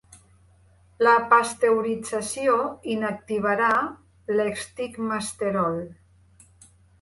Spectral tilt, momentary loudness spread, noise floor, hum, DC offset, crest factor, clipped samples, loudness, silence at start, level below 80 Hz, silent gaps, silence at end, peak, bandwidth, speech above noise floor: -4.5 dB/octave; 12 LU; -57 dBFS; none; under 0.1%; 20 dB; under 0.1%; -24 LUFS; 1 s; -60 dBFS; none; 1.1 s; -6 dBFS; 11.5 kHz; 34 dB